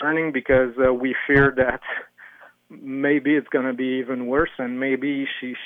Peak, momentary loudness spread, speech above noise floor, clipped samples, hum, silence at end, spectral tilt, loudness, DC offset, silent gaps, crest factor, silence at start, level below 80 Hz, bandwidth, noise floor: -4 dBFS; 11 LU; 26 dB; under 0.1%; none; 0 s; -8.5 dB/octave; -22 LUFS; under 0.1%; none; 18 dB; 0 s; -46 dBFS; 4.1 kHz; -48 dBFS